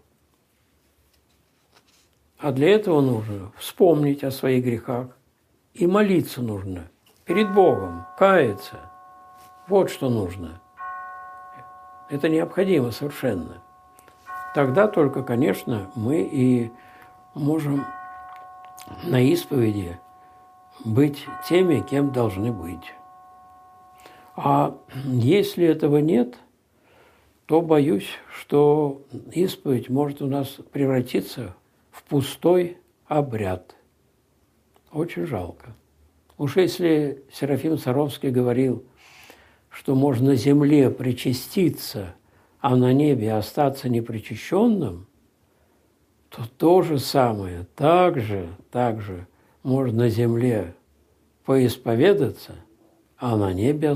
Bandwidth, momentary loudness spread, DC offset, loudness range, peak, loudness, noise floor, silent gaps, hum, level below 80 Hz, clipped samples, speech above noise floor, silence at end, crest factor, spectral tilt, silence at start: 15.5 kHz; 18 LU; under 0.1%; 5 LU; -4 dBFS; -22 LUFS; -64 dBFS; none; none; -62 dBFS; under 0.1%; 43 dB; 0 s; 20 dB; -7 dB/octave; 2.4 s